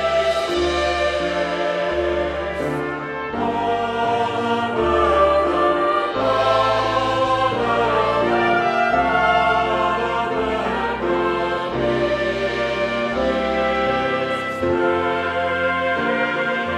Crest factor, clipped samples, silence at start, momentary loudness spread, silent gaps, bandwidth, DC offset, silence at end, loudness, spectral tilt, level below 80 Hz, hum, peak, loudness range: 14 dB; under 0.1%; 0 s; 5 LU; none; 12 kHz; under 0.1%; 0 s; -19 LUFS; -5.5 dB/octave; -40 dBFS; none; -4 dBFS; 4 LU